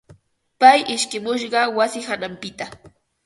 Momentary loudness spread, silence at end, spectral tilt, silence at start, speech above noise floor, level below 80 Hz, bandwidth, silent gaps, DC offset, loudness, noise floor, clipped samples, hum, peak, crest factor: 18 LU; 0.4 s; -2 dB/octave; 0.1 s; 33 dB; -62 dBFS; 11.5 kHz; none; under 0.1%; -18 LUFS; -52 dBFS; under 0.1%; none; 0 dBFS; 20 dB